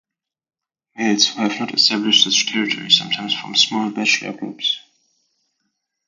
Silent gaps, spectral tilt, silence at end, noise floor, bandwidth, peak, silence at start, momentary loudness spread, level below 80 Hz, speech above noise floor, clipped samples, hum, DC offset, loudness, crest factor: none; -1.5 dB/octave; 1.3 s; -74 dBFS; 10 kHz; 0 dBFS; 0.95 s; 9 LU; -70 dBFS; 55 dB; under 0.1%; none; under 0.1%; -16 LUFS; 20 dB